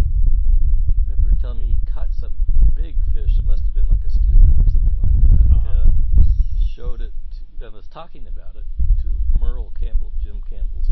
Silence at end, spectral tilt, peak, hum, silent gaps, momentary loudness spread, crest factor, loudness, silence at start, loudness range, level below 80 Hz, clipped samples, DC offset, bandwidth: 0 s; -10.5 dB/octave; 0 dBFS; none; none; 21 LU; 12 dB; -21 LUFS; 0 s; 9 LU; -16 dBFS; under 0.1%; under 0.1%; 1.5 kHz